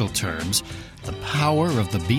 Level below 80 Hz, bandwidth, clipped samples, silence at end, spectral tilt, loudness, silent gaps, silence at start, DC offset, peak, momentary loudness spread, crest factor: -44 dBFS; 16.5 kHz; under 0.1%; 0 s; -4.5 dB/octave; -23 LUFS; none; 0 s; under 0.1%; -8 dBFS; 14 LU; 14 dB